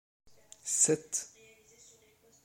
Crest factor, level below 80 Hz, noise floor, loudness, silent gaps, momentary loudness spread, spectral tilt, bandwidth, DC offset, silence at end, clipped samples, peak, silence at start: 22 dB; -76 dBFS; -64 dBFS; -29 LUFS; none; 18 LU; -2.5 dB/octave; 16.5 kHz; under 0.1%; 1.2 s; under 0.1%; -14 dBFS; 0.65 s